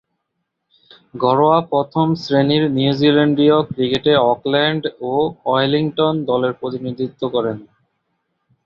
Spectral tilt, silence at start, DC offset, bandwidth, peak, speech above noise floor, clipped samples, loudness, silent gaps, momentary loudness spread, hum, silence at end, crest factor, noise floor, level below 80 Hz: -7.5 dB/octave; 1.15 s; under 0.1%; 7 kHz; -2 dBFS; 58 dB; under 0.1%; -17 LUFS; none; 9 LU; none; 1 s; 16 dB; -75 dBFS; -56 dBFS